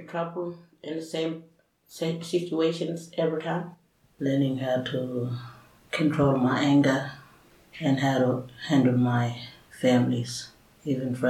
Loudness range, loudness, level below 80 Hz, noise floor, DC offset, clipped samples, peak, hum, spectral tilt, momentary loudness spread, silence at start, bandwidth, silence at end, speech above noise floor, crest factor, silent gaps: 6 LU; -27 LUFS; -64 dBFS; -56 dBFS; under 0.1%; under 0.1%; -10 dBFS; none; -6.5 dB/octave; 16 LU; 0 s; 14 kHz; 0 s; 30 dB; 18 dB; none